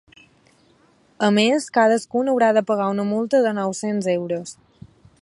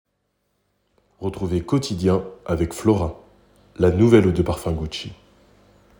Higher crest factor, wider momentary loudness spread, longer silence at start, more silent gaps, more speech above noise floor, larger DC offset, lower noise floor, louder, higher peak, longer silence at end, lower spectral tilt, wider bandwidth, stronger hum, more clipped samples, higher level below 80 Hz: about the same, 18 dB vs 20 dB; second, 7 LU vs 15 LU; about the same, 1.2 s vs 1.2 s; neither; second, 38 dB vs 52 dB; neither; second, -57 dBFS vs -72 dBFS; about the same, -20 LUFS vs -21 LUFS; about the same, -4 dBFS vs -2 dBFS; second, 0.7 s vs 0.85 s; second, -5 dB/octave vs -7 dB/octave; second, 11.5 kHz vs 18 kHz; neither; neither; second, -66 dBFS vs -40 dBFS